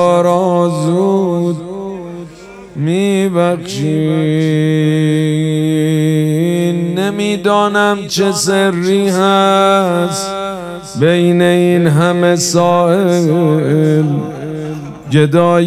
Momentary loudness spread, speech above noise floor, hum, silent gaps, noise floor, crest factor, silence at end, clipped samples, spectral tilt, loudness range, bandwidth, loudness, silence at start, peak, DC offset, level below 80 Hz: 12 LU; 22 dB; none; none; -33 dBFS; 12 dB; 0 s; under 0.1%; -6 dB/octave; 4 LU; 14.5 kHz; -13 LUFS; 0 s; 0 dBFS; under 0.1%; -52 dBFS